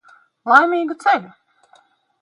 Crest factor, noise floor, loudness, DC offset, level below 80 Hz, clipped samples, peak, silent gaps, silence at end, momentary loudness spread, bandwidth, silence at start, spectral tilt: 20 dB; -55 dBFS; -16 LUFS; under 0.1%; -76 dBFS; under 0.1%; 0 dBFS; none; 0.95 s; 8 LU; 11 kHz; 0.45 s; -4 dB/octave